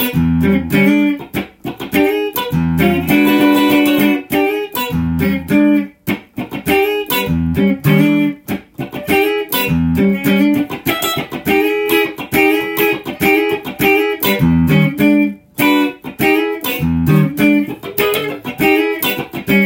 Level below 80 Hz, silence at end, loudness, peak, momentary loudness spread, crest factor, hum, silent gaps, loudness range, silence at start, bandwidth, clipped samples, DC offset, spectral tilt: -40 dBFS; 0 s; -14 LUFS; 0 dBFS; 8 LU; 14 dB; none; none; 2 LU; 0 s; 17 kHz; under 0.1%; under 0.1%; -6 dB/octave